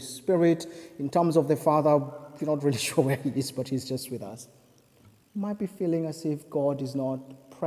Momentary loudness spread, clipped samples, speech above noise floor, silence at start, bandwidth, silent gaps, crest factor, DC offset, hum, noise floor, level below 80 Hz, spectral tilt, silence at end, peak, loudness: 14 LU; under 0.1%; 32 dB; 0 s; 16 kHz; none; 20 dB; under 0.1%; none; -59 dBFS; -68 dBFS; -6 dB/octave; 0 s; -8 dBFS; -27 LUFS